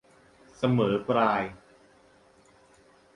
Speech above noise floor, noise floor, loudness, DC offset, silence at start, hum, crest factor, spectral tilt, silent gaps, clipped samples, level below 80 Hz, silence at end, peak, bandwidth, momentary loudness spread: 34 dB; -59 dBFS; -26 LUFS; under 0.1%; 0.6 s; none; 20 dB; -7.5 dB/octave; none; under 0.1%; -62 dBFS; 1.6 s; -10 dBFS; 10.5 kHz; 6 LU